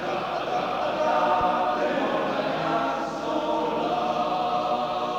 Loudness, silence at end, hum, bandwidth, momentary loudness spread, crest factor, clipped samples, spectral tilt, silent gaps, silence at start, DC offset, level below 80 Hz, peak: -25 LUFS; 0 s; none; 17.5 kHz; 5 LU; 14 dB; under 0.1%; -5 dB/octave; none; 0 s; under 0.1%; -56 dBFS; -10 dBFS